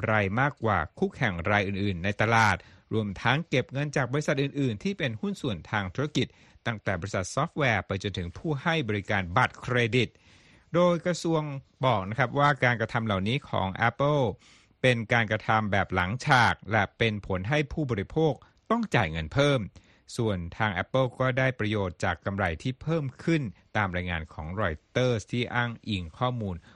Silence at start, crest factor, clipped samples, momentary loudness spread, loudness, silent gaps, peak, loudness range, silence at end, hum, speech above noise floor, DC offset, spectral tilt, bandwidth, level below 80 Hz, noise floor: 0 s; 20 dB; under 0.1%; 8 LU; -28 LUFS; none; -8 dBFS; 4 LU; 0.15 s; none; 30 dB; under 0.1%; -6 dB/octave; 11.5 kHz; -52 dBFS; -57 dBFS